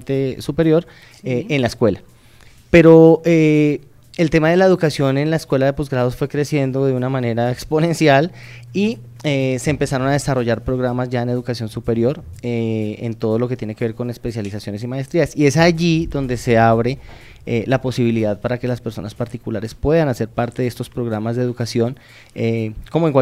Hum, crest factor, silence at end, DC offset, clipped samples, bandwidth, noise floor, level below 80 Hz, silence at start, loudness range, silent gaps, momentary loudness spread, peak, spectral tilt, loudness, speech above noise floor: none; 18 dB; 0 s; under 0.1%; under 0.1%; 15 kHz; -45 dBFS; -40 dBFS; 0 s; 8 LU; none; 12 LU; 0 dBFS; -7 dB/octave; -18 LUFS; 28 dB